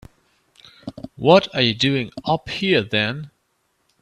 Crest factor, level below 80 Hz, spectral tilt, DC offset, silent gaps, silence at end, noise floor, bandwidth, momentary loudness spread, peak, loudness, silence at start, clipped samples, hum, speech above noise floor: 22 dB; -54 dBFS; -5.5 dB/octave; under 0.1%; none; 0.75 s; -68 dBFS; 11.5 kHz; 22 LU; 0 dBFS; -19 LUFS; 0.85 s; under 0.1%; none; 49 dB